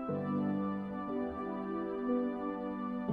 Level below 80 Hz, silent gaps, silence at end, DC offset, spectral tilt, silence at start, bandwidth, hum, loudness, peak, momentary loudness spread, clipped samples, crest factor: -64 dBFS; none; 0 s; under 0.1%; -10 dB/octave; 0 s; 5 kHz; none; -37 LUFS; -22 dBFS; 4 LU; under 0.1%; 14 dB